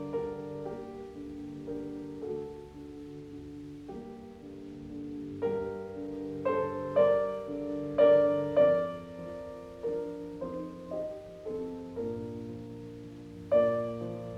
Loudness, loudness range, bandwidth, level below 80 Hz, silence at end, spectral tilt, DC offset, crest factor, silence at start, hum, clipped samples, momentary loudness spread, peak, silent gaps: -32 LUFS; 14 LU; 7.6 kHz; -60 dBFS; 0 s; -8 dB/octave; under 0.1%; 20 dB; 0 s; none; under 0.1%; 19 LU; -12 dBFS; none